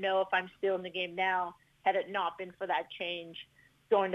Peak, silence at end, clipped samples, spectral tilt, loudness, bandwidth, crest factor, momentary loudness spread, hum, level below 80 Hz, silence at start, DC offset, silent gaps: -16 dBFS; 0 s; under 0.1%; -5.5 dB/octave; -33 LUFS; 9.2 kHz; 18 dB; 10 LU; none; -76 dBFS; 0 s; under 0.1%; none